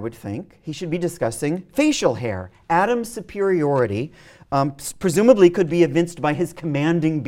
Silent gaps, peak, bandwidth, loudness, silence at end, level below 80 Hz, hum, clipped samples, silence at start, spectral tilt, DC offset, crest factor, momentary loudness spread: none; 0 dBFS; 16.5 kHz; -20 LUFS; 0 s; -54 dBFS; none; under 0.1%; 0 s; -6 dB/octave; under 0.1%; 20 dB; 15 LU